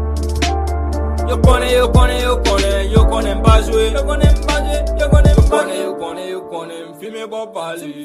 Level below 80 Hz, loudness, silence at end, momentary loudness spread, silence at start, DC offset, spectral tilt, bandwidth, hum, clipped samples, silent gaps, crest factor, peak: -16 dBFS; -15 LUFS; 0 s; 14 LU; 0 s; under 0.1%; -6 dB/octave; 14 kHz; none; under 0.1%; none; 14 dB; 0 dBFS